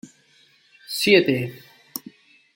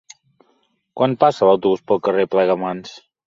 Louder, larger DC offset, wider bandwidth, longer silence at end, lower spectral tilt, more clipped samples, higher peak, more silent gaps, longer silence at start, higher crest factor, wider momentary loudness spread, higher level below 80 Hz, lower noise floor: second, -20 LUFS vs -17 LUFS; neither; first, 17 kHz vs 7.6 kHz; first, 0.55 s vs 0.3 s; second, -4.5 dB/octave vs -6.5 dB/octave; neither; about the same, -2 dBFS vs -2 dBFS; neither; second, 0.05 s vs 0.95 s; about the same, 22 dB vs 18 dB; first, 19 LU vs 15 LU; second, -68 dBFS vs -62 dBFS; second, -58 dBFS vs -64 dBFS